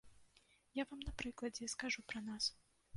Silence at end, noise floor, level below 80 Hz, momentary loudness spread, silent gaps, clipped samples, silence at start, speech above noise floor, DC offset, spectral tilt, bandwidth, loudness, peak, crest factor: 0 s; -73 dBFS; -60 dBFS; 5 LU; none; under 0.1%; 0.05 s; 28 dB; under 0.1%; -2.5 dB/octave; 11.5 kHz; -44 LUFS; -24 dBFS; 22 dB